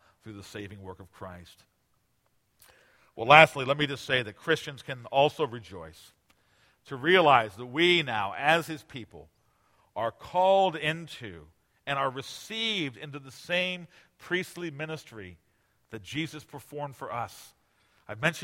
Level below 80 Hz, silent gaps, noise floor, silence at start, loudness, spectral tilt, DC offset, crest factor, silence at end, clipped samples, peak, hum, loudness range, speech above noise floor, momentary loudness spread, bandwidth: -66 dBFS; none; -72 dBFS; 0.25 s; -26 LUFS; -4.5 dB/octave; under 0.1%; 30 dB; 0 s; under 0.1%; 0 dBFS; none; 13 LU; 44 dB; 23 LU; 16.5 kHz